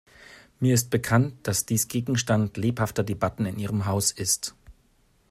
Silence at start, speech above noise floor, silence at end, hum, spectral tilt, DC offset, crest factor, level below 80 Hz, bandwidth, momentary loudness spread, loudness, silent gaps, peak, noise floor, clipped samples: 0.3 s; 38 dB; 0.6 s; none; -4.5 dB/octave; under 0.1%; 18 dB; -54 dBFS; 15.5 kHz; 5 LU; -25 LUFS; none; -8 dBFS; -63 dBFS; under 0.1%